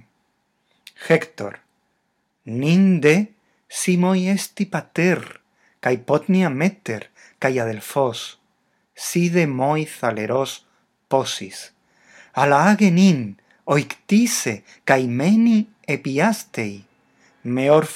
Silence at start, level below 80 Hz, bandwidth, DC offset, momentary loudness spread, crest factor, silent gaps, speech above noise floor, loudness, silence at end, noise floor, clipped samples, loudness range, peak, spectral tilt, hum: 1 s; -72 dBFS; 15.5 kHz; under 0.1%; 16 LU; 20 dB; none; 51 dB; -20 LUFS; 0 s; -70 dBFS; under 0.1%; 5 LU; 0 dBFS; -5.5 dB/octave; none